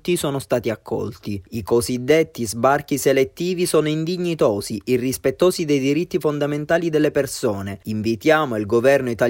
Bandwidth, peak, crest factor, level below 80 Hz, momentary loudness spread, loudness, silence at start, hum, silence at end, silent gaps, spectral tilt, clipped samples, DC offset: 16.5 kHz; -4 dBFS; 16 dB; -52 dBFS; 8 LU; -20 LUFS; 0.05 s; none; 0 s; none; -5 dB/octave; under 0.1%; under 0.1%